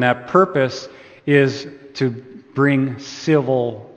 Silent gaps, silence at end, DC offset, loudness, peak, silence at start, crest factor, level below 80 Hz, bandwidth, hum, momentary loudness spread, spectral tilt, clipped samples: none; 0.05 s; under 0.1%; -18 LUFS; 0 dBFS; 0 s; 18 dB; -62 dBFS; 8.6 kHz; none; 15 LU; -6.5 dB/octave; under 0.1%